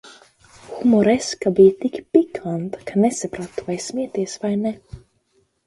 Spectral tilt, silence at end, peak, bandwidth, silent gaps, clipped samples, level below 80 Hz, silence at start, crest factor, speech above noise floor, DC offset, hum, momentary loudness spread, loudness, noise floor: -6 dB/octave; 0.7 s; 0 dBFS; 11.5 kHz; none; under 0.1%; -56 dBFS; 0.05 s; 20 dB; 45 dB; under 0.1%; none; 13 LU; -20 LUFS; -64 dBFS